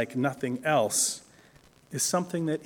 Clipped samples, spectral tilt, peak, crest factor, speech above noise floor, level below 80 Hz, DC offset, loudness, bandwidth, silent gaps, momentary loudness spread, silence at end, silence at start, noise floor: under 0.1%; -3.5 dB/octave; -12 dBFS; 18 dB; 30 dB; -70 dBFS; under 0.1%; -27 LUFS; 18 kHz; none; 8 LU; 0 s; 0 s; -58 dBFS